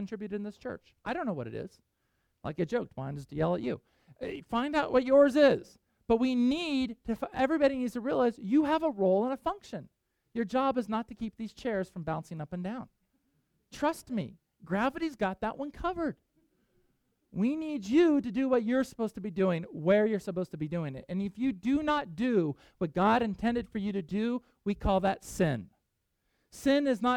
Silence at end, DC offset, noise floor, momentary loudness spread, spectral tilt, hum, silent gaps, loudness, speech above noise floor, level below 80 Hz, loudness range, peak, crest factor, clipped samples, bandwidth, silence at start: 0 s; under 0.1%; -80 dBFS; 14 LU; -6.5 dB/octave; none; none; -30 LUFS; 50 dB; -56 dBFS; 8 LU; -10 dBFS; 20 dB; under 0.1%; 15 kHz; 0 s